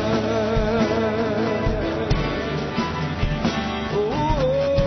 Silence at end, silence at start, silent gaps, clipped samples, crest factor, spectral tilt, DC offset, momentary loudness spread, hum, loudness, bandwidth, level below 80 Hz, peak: 0 s; 0 s; none; under 0.1%; 14 dB; -6.5 dB/octave; under 0.1%; 4 LU; none; -23 LUFS; 6.4 kHz; -32 dBFS; -8 dBFS